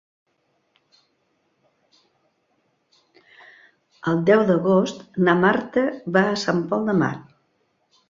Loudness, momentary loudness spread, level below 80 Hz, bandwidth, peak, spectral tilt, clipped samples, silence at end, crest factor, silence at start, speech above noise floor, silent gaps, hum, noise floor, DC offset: -20 LUFS; 8 LU; -64 dBFS; 7.6 kHz; -2 dBFS; -6.5 dB/octave; under 0.1%; 0.85 s; 22 dB; 4.05 s; 49 dB; none; none; -69 dBFS; under 0.1%